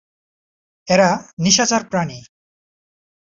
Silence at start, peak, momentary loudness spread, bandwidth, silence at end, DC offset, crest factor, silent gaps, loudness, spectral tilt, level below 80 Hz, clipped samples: 0.85 s; -2 dBFS; 9 LU; 7.8 kHz; 1.05 s; under 0.1%; 20 dB; 1.33-1.37 s; -16 LUFS; -3.5 dB/octave; -56 dBFS; under 0.1%